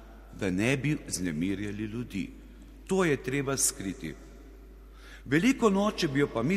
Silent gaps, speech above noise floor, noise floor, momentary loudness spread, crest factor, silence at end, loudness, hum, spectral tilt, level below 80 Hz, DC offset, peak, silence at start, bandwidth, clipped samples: none; 20 dB; -49 dBFS; 16 LU; 18 dB; 0 s; -29 LUFS; none; -4.5 dB/octave; -50 dBFS; under 0.1%; -12 dBFS; 0 s; 15 kHz; under 0.1%